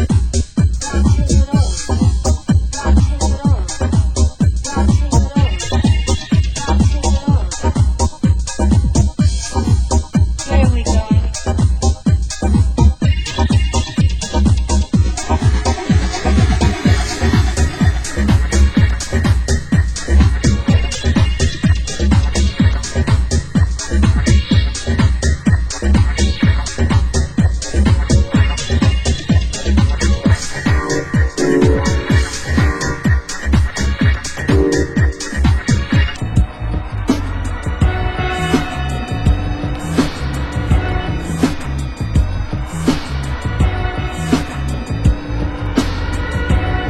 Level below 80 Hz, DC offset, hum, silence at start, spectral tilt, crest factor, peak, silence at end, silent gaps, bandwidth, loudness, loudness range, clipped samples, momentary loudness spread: -18 dBFS; under 0.1%; none; 0 s; -5.5 dB/octave; 14 dB; 0 dBFS; 0 s; none; 12 kHz; -16 LUFS; 4 LU; under 0.1%; 5 LU